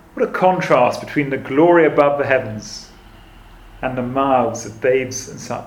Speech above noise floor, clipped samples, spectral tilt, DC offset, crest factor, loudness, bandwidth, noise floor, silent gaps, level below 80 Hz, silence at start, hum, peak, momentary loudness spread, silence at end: 25 dB; under 0.1%; -5.5 dB/octave; under 0.1%; 18 dB; -17 LUFS; 16.5 kHz; -42 dBFS; none; -48 dBFS; 0.15 s; none; 0 dBFS; 15 LU; 0 s